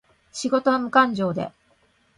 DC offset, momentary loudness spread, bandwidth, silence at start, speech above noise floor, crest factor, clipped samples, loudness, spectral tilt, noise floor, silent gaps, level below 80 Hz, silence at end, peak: under 0.1%; 14 LU; 11 kHz; 0.35 s; 41 dB; 20 dB; under 0.1%; -22 LUFS; -5 dB/octave; -62 dBFS; none; -62 dBFS; 0.7 s; -4 dBFS